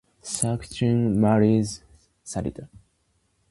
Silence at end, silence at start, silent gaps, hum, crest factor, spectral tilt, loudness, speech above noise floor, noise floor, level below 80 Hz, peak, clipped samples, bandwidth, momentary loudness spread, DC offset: 0.85 s; 0.25 s; none; none; 22 dB; -6 dB/octave; -24 LUFS; 47 dB; -69 dBFS; -50 dBFS; -2 dBFS; under 0.1%; 11.5 kHz; 18 LU; under 0.1%